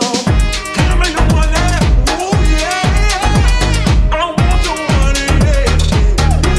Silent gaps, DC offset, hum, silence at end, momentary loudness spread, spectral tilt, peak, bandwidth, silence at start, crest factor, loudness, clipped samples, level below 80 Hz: none; under 0.1%; none; 0 s; 2 LU; -5 dB/octave; 0 dBFS; 13 kHz; 0 s; 10 dB; -13 LUFS; under 0.1%; -14 dBFS